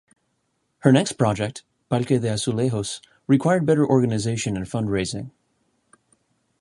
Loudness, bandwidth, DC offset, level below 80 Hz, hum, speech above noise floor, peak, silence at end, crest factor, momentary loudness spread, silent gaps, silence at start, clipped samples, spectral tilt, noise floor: -22 LUFS; 11.5 kHz; under 0.1%; -52 dBFS; none; 51 dB; -2 dBFS; 1.3 s; 22 dB; 12 LU; none; 0.85 s; under 0.1%; -6 dB/octave; -72 dBFS